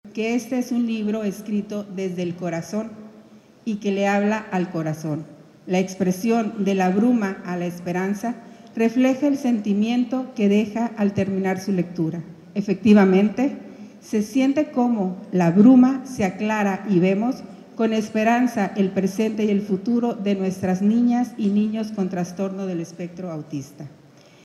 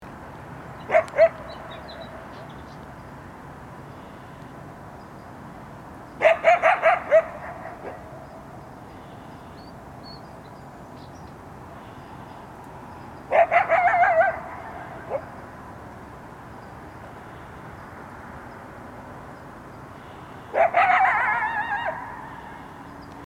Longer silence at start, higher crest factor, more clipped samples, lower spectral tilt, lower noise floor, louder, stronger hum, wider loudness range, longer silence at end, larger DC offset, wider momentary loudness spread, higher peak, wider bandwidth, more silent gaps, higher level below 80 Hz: about the same, 0.05 s vs 0 s; about the same, 18 dB vs 22 dB; neither; first, -7 dB/octave vs -5.5 dB/octave; first, -48 dBFS vs -42 dBFS; about the same, -22 LUFS vs -21 LUFS; neither; second, 7 LU vs 19 LU; first, 0.55 s vs 0.05 s; neither; second, 12 LU vs 23 LU; about the same, -4 dBFS vs -4 dBFS; about the same, 12.5 kHz vs 12.5 kHz; neither; second, -66 dBFS vs -54 dBFS